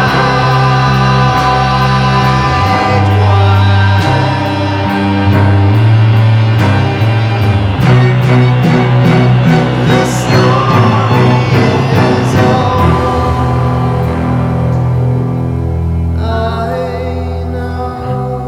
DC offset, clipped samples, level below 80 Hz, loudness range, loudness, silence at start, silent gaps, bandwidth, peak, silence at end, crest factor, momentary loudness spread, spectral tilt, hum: under 0.1%; under 0.1%; -26 dBFS; 5 LU; -10 LUFS; 0 s; none; 12 kHz; 0 dBFS; 0 s; 10 dB; 7 LU; -7 dB/octave; none